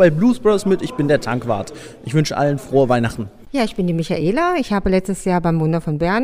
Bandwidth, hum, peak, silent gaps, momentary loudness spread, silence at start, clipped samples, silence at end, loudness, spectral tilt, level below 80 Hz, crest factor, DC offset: 15.5 kHz; none; 0 dBFS; none; 8 LU; 0 s; under 0.1%; 0 s; -18 LUFS; -6.5 dB/octave; -40 dBFS; 16 dB; under 0.1%